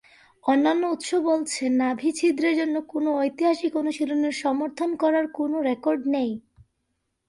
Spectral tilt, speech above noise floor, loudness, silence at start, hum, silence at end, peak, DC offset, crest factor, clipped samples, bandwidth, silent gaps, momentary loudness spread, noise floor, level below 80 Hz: -3.5 dB/octave; 53 dB; -24 LUFS; 0.45 s; none; 0.9 s; -10 dBFS; under 0.1%; 14 dB; under 0.1%; 11.5 kHz; none; 5 LU; -76 dBFS; -68 dBFS